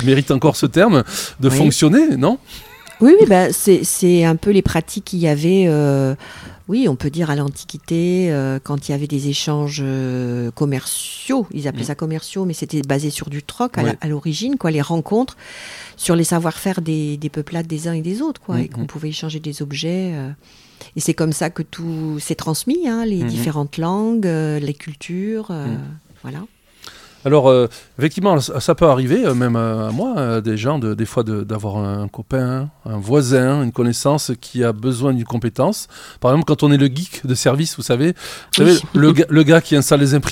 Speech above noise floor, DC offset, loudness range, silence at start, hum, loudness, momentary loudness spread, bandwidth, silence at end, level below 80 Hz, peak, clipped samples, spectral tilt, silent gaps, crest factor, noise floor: 25 dB; under 0.1%; 9 LU; 0 s; none; -17 LUFS; 13 LU; 16.5 kHz; 0 s; -46 dBFS; 0 dBFS; under 0.1%; -6 dB/octave; none; 16 dB; -42 dBFS